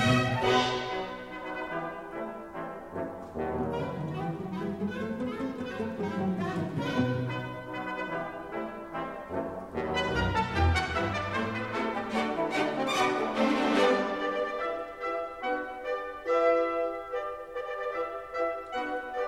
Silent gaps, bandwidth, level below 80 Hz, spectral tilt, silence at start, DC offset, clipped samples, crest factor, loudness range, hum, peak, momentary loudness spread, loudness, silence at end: none; 15.5 kHz; -48 dBFS; -5.5 dB/octave; 0 s; under 0.1%; under 0.1%; 18 dB; 7 LU; none; -12 dBFS; 12 LU; -31 LUFS; 0 s